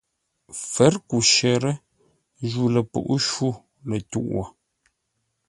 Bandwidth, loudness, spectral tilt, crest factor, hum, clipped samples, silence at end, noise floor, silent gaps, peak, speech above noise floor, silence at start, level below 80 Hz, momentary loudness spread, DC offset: 11.5 kHz; -22 LUFS; -4 dB/octave; 22 dB; none; under 0.1%; 1 s; -75 dBFS; none; -2 dBFS; 53 dB; 0.5 s; -54 dBFS; 17 LU; under 0.1%